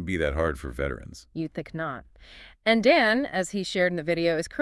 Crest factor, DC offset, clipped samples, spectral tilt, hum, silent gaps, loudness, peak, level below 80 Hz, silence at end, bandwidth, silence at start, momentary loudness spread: 20 dB; under 0.1%; under 0.1%; -5 dB/octave; none; none; -25 LUFS; -6 dBFS; -44 dBFS; 0 s; 12 kHz; 0 s; 15 LU